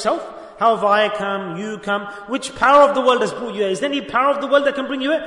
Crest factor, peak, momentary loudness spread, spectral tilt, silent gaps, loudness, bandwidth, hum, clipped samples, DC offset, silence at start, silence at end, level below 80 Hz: 18 dB; 0 dBFS; 13 LU; -4 dB/octave; none; -18 LUFS; 11 kHz; none; under 0.1%; under 0.1%; 0 s; 0 s; -56 dBFS